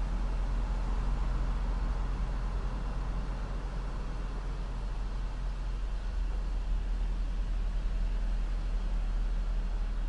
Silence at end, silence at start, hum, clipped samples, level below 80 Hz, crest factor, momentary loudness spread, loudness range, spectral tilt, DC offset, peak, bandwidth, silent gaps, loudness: 0 s; 0 s; none; under 0.1%; -32 dBFS; 10 dB; 4 LU; 3 LU; -6.5 dB/octave; under 0.1%; -22 dBFS; 7.6 kHz; none; -37 LUFS